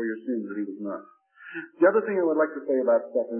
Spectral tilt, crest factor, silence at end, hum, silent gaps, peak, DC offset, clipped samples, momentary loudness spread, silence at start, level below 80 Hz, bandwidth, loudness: -11 dB/octave; 18 dB; 0 s; none; none; -8 dBFS; under 0.1%; under 0.1%; 17 LU; 0 s; -88 dBFS; 3.3 kHz; -25 LUFS